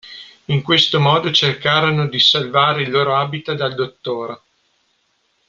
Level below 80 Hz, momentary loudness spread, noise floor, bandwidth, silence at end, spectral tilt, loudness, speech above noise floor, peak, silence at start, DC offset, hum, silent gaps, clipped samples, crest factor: -56 dBFS; 13 LU; -64 dBFS; 7.4 kHz; 1.15 s; -5 dB/octave; -16 LUFS; 48 dB; -2 dBFS; 0.05 s; under 0.1%; none; none; under 0.1%; 16 dB